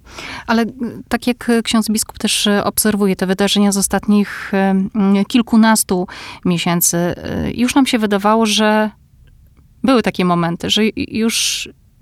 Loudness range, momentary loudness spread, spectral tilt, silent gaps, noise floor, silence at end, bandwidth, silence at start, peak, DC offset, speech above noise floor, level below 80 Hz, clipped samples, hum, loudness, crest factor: 2 LU; 9 LU; -4 dB/octave; none; -47 dBFS; 0.3 s; 16 kHz; 0.1 s; 0 dBFS; under 0.1%; 31 dB; -44 dBFS; under 0.1%; none; -15 LUFS; 14 dB